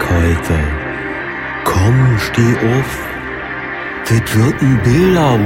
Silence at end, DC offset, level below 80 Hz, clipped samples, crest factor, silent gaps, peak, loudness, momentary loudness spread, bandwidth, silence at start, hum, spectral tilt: 0 s; under 0.1%; -30 dBFS; under 0.1%; 12 dB; none; 0 dBFS; -14 LUFS; 11 LU; 16.5 kHz; 0 s; none; -6.5 dB/octave